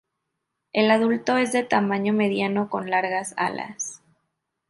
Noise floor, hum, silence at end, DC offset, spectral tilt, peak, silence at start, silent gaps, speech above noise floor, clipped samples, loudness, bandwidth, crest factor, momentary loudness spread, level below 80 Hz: -80 dBFS; none; 0.75 s; under 0.1%; -4.5 dB/octave; -6 dBFS; 0.75 s; none; 57 dB; under 0.1%; -23 LUFS; 11.5 kHz; 18 dB; 10 LU; -70 dBFS